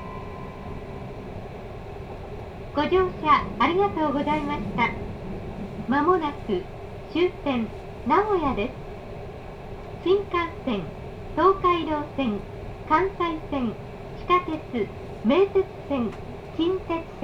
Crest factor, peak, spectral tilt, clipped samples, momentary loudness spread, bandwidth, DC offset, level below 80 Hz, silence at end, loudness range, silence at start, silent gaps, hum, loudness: 20 dB; -6 dBFS; -7.5 dB/octave; under 0.1%; 17 LU; 7.8 kHz; under 0.1%; -44 dBFS; 0 s; 3 LU; 0 s; none; none; -25 LUFS